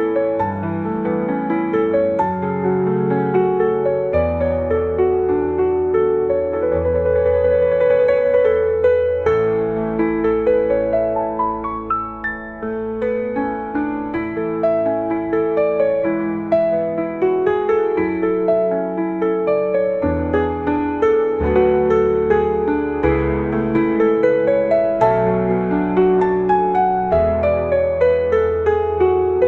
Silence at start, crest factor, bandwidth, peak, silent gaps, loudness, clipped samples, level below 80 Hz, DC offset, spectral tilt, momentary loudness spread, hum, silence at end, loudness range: 0 s; 14 dB; 4.3 kHz; -2 dBFS; none; -18 LUFS; under 0.1%; -40 dBFS; 0.1%; -9.5 dB/octave; 6 LU; none; 0 s; 4 LU